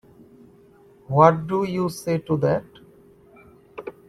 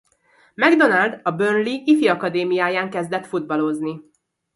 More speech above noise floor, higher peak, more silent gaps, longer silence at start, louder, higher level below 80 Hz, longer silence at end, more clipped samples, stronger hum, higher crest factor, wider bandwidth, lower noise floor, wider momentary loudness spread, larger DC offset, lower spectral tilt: second, 32 dB vs 39 dB; about the same, -2 dBFS vs 0 dBFS; neither; first, 1.1 s vs 0.6 s; about the same, -21 LUFS vs -19 LUFS; first, -58 dBFS vs -70 dBFS; second, 0.2 s vs 0.55 s; neither; neither; about the same, 22 dB vs 20 dB; first, 14.5 kHz vs 11.5 kHz; second, -52 dBFS vs -58 dBFS; first, 22 LU vs 10 LU; neither; first, -7.5 dB/octave vs -6 dB/octave